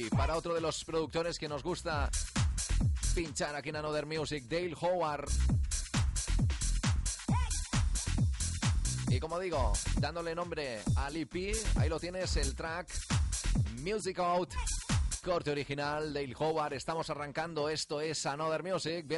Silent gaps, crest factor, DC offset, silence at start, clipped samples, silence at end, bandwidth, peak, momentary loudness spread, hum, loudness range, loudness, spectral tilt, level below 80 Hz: none; 14 dB; under 0.1%; 0 s; under 0.1%; 0 s; 11.5 kHz; -18 dBFS; 4 LU; none; 2 LU; -34 LUFS; -4.5 dB/octave; -38 dBFS